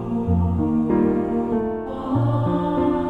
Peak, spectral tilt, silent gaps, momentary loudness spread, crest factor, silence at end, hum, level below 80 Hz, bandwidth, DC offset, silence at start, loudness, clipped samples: -8 dBFS; -10.5 dB/octave; none; 5 LU; 12 dB; 0 s; none; -38 dBFS; 4.4 kHz; under 0.1%; 0 s; -21 LUFS; under 0.1%